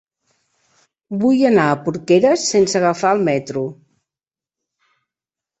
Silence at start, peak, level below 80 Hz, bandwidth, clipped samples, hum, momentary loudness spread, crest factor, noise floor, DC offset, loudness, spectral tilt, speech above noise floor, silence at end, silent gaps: 1.1 s; -2 dBFS; -60 dBFS; 8.4 kHz; under 0.1%; none; 12 LU; 18 dB; under -90 dBFS; under 0.1%; -16 LUFS; -5 dB/octave; over 74 dB; 1.85 s; none